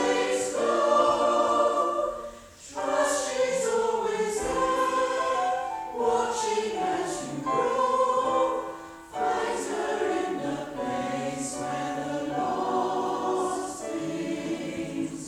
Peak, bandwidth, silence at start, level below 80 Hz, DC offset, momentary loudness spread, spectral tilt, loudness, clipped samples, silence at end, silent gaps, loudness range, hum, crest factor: -10 dBFS; 16 kHz; 0 s; -58 dBFS; under 0.1%; 9 LU; -3.5 dB/octave; -27 LUFS; under 0.1%; 0 s; none; 4 LU; none; 16 dB